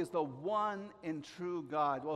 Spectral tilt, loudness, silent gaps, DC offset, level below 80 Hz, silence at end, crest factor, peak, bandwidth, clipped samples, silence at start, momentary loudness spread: -6.5 dB/octave; -38 LUFS; none; under 0.1%; -78 dBFS; 0 s; 16 dB; -22 dBFS; 13 kHz; under 0.1%; 0 s; 8 LU